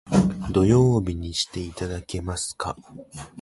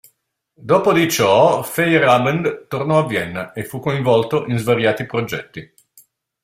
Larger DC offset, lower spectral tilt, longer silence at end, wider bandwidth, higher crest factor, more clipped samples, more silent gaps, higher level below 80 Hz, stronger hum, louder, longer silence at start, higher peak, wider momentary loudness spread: neither; about the same, -6 dB/octave vs -5 dB/octave; second, 0 s vs 0.8 s; second, 11.5 kHz vs 16 kHz; about the same, 18 dB vs 16 dB; neither; neither; first, -40 dBFS vs -56 dBFS; neither; second, -24 LUFS vs -17 LUFS; second, 0.05 s vs 0.6 s; second, -6 dBFS vs -2 dBFS; first, 21 LU vs 14 LU